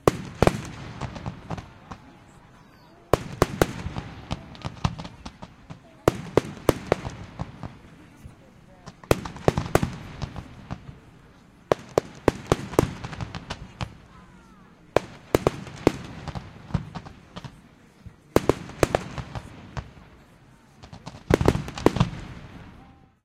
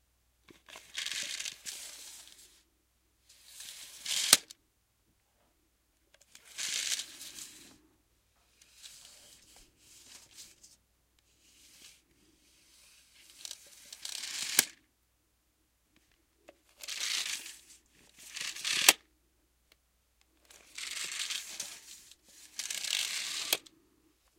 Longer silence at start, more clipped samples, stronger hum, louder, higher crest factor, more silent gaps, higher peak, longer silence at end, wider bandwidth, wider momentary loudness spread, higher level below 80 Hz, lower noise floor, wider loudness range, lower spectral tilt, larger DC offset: second, 0.05 s vs 0.5 s; neither; neither; first, -27 LUFS vs -32 LUFS; second, 28 dB vs 40 dB; neither; about the same, 0 dBFS vs 0 dBFS; second, 0.35 s vs 0.8 s; about the same, 16 kHz vs 16.5 kHz; second, 21 LU vs 28 LU; first, -42 dBFS vs -76 dBFS; second, -53 dBFS vs -74 dBFS; second, 2 LU vs 23 LU; first, -6 dB/octave vs 2 dB/octave; neither